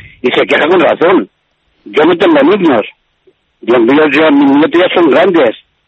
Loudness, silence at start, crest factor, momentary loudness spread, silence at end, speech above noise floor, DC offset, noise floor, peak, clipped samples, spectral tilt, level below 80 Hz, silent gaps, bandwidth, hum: -8 LUFS; 0.25 s; 10 dB; 7 LU; 0.3 s; 49 dB; under 0.1%; -57 dBFS; 0 dBFS; under 0.1%; -6.5 dB/octave; -52 dBFS; none; 7.8 kHz; none